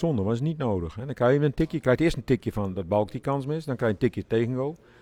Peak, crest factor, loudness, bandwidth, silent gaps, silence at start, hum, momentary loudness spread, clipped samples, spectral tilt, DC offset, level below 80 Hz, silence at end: -10 dBFS; 16 dB; -26 LUFS; 14 kHz; none; 0 s; none; 8 LU; under 0.1%; -8 dB/octave; under 0.1%; -46 dBFS; 0.25 s